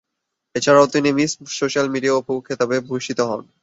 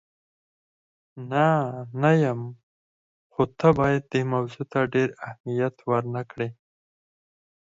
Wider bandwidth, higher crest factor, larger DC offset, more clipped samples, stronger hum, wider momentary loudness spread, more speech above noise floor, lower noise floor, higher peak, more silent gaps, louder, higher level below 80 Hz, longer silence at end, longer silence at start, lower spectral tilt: about the same, 8 kHz vs 7.8 kHz; about the same, 18 dB vs 20 dB; neither; neither; neither; second, 10 LU vs 13 LU; second, 60 dB vs over 66 dB; second, -79 dBFS vs under -90 dBFS; first, -2 dBFS vs -6 dBFS; second, none vs 2.63-3.30 s, 5.40-5.44 s; first, -19 LUFS vs -25 LUFS; about the same, -62 dBFS vs -58 dBFS; second, 0.2 s vs 1.15 s; second, 0.55 s vs 1.15 s; second, -4.5 dB/octave vs -8 dB/octave